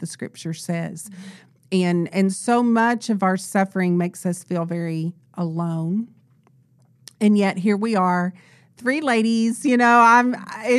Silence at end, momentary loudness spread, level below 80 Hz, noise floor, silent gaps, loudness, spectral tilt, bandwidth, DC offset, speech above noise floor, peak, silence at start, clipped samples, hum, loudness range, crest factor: 0 s; 14 LU; -78 dBFS; -57 dBFS; none; -20 LUFS; -6 dB/octave; 13 kHz; under 0.1%; 37 dB; -4 dBFS; 0 s; under 0.1%; none; 7 LU; 18 dB